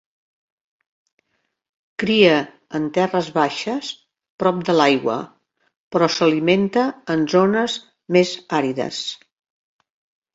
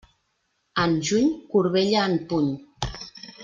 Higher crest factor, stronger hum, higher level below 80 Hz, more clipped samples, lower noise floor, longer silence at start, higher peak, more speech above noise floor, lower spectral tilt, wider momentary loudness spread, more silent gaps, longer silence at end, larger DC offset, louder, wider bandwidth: about the same, 20 dB vs 18 dB; neither; second, -62 dBFS vs -48 dBFS; neither; about the same, -70 dBFS vs -73 dBFS; first, 2 s vs 0.75 s; first, -2 dBFS vs -6 dBFS; about the same, 52 dB vs 51 dB; about the same, -5 dB/octave vs -5 dB/octave; about the same, 13 LU vs 12 LU; first, 4.30-4.39 s, 5.76-5.91 s vs none; first, 1.2 s vs 0 s; neither; first, -19 LUFS vs -24 LUFS; second, 8 kHz vs 9.4 kHz